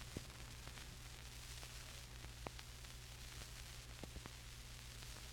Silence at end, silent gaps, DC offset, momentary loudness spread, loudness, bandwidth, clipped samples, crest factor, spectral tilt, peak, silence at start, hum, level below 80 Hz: 0 s; none; under 0.1%; 2 LU; -54 LUFS; 18 kHz; under 0.1%; 26 dB; -3 dB/octave; -28 dBFS; 0 s; 60 Hz at -60 dBFS; -58 dBFS